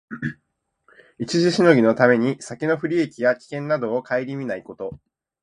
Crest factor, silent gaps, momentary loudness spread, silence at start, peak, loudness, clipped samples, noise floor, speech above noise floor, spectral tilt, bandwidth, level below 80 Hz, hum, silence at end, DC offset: 22 dB; none; 16 LU; 0.1 s; 0 dBFS; -21 LUFS; under 0.1%; -74 dBFS; 54 dB; -6 dB/octave; 10.5 kHz; -62 dBFS; none; 0.45 s; under 0.1%